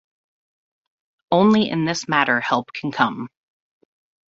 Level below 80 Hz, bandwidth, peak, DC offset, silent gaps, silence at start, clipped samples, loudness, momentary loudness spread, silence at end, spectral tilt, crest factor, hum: -62 dBFS; 7.8 kHz; -2 dBFS; under 0.1%; none; 1.3 s; under 0.1%; -19 LUFS; 11 LU; 1.05 s; -5 dB/octave; 20 dB; none